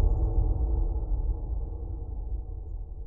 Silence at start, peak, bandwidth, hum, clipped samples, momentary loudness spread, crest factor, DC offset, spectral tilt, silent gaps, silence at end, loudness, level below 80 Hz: 0 s; -14 dBFS; 1.4 kHz; none; under 0.1%; 10 LU; 14 dB; 0.4%; -14.5 dB/octave; none; 0 s; -33 LUFS; -28 dBFS